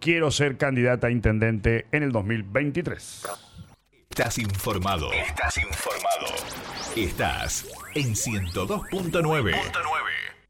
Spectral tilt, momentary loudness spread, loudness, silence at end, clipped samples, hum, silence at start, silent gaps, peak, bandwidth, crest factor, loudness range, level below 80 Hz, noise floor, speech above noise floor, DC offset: -4.5 dB/octave; 9 LU; -26 LUFS; 0.15 s; under 0.1%; none; 0 s; none; -6 dBFS; 19 kHz; 20 dB; 3 LU; -40 dBFS; -53 dBFS; 28 dB; under 0.1%